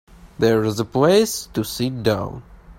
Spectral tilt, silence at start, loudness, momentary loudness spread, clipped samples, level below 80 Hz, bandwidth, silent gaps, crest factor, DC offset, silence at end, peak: -5 dB/octave; 0.25 s; -20 LUFS; 10 LU; under 0.1%; -46 dBFS; 16.5 kHz; none; 16 dB; under 0.1%; 0.05 s; -4 dBFS